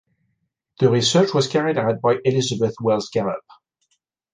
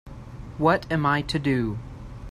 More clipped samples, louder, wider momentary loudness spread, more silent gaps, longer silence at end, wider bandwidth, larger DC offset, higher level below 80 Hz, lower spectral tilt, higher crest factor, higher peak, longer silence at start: neither; first, -20 LUFS vs -24 LUFS; second, 7 LU vs 18 LU; neither; first, 0.95 s vs 0 s; second, 9.8 kHz vs 13 kHz; neither; second, -60 dBFS vs -44 dBFS; second, -5 dB/octave vs -6.5 dB/octave; about the same, 18 dB vs 20 dB; about the same, -4 dBFS vs -6 dBFS; first, 0.8 s vs 0.05 s